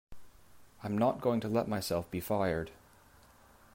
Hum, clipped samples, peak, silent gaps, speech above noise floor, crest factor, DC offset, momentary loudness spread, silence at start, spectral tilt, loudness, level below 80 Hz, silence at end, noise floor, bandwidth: none; under 0.1%; -18 dBFS; none; 28 dB; 18 dB; under 0.1%; 8 LU; 0.1 s; -6 dB/octave; -33 LUFS; -60 dBFS; 1 s; -60 dBFS; 16 kHz